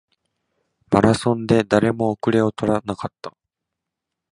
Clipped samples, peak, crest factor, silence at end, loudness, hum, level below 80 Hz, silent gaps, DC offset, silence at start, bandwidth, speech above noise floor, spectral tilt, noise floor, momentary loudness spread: under 0.1%; 0 dBFS; 20 dB; 1 s; -19 LUFS; none; -48 dBFS; none; under 0.1%; 0.9 s; 11 kHz; 64 dB; -6.5 dB/octave; -83 dBFS; 14 LU